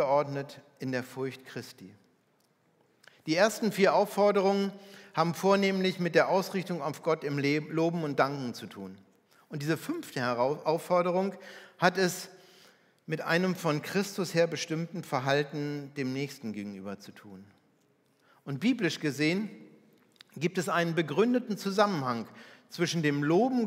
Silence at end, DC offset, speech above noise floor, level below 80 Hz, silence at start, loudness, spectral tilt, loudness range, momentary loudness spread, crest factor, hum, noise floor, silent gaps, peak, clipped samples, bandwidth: 0 s; under 0.1%; 40 dB; -86 dBFS; 0 s; -30 LUFS; -5.5 dB/octave; 7 LU; 17 LU; 24 dB; none; -70 dBFS; none; -8 dBFS; under 0.1%; 16 kHz